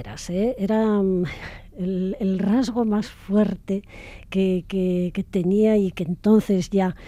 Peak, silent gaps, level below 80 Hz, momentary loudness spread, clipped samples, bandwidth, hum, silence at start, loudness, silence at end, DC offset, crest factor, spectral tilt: -6 dBFS; none; -46 dBFS; 10 LU; under 0.1%; 12 kHz; none; 0 s; -22 LUFS; 0 s; under 0.1%; 16 dB; -7.5 dB/octave